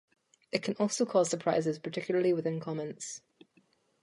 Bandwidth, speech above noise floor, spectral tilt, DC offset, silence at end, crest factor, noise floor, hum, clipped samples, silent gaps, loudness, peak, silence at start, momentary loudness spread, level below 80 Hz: 11.5 kHz; 38 dB; -5 dB/octave; under 0.1%; 0.85 s; 22 dB; -69 dBFS; none; under 0.1%; none; -32 LUFS; -10 dBFS; 0.55 s; 11 LU; -78 dBFS